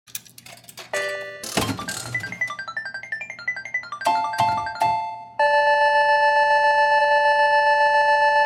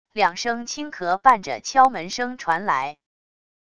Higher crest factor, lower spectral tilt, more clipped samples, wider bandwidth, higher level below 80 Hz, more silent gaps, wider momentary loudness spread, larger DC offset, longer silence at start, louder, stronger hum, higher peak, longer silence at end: second, 14 dB vs 20 dB; about the same, -2.5 dB/octave vs -2.5 dB/octave; neither; first, 17 kHz vs 11 kHz; about the same, -58 dBFS vs -62 dBFS; neither; first, 13 LU vs 10 LU; second, under 0.1% vs 0.4%; about the same, 0.15 s vs 0.15 s; about the same, -20 LUFS vs -21 LUFS; neither; second, -6 dBFS vs -2 dBFS; second, 0 s vs 0.8 s